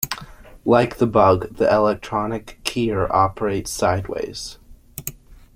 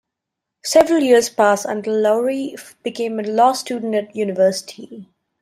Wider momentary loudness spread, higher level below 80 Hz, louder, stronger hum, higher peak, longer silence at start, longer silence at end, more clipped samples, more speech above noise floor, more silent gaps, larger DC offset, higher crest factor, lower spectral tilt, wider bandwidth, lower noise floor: about the same, 16 LU vs 16 LU; first, -44 dBFS vs -60 dBFS; second, -20 LUFS vs -17 LUFS; neither; about the same, 0 dBFS vs -2 dBFS; second, 0 s vs 0.65 s; second, 0.2 s vs 0.4 s; neither; second, 21 dB vs 64 dB; neither; neither; about the same, 20 dB vs 16 dB; first, -5.5 dB/octave vs -4 dB/octave; about the same, 16.5 kHz vs 16 kHz; second, -40 dBFS vs -81 dBFS